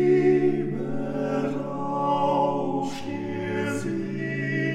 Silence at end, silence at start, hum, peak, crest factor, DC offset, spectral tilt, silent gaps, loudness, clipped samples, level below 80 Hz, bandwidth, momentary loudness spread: 0 s; 0 s; none; -10 dBFS; 14 dB; under 0.1%; -7 dB/octave; none; -26 LUFS; under 0.1%; -58 dBFS; 12 kHz; 9 LU